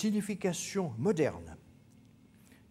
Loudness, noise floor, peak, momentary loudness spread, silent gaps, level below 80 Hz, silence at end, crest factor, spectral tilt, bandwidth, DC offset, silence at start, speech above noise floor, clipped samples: -33 LUFS; -60 dBFS; -16 dBFS; 19 LU; none; -68 dBFS; 1 s; 18 dB; -5.5 dB/octave; 15.5 kHz; under 0.1%; 0 s; 27 dB; under 0.1%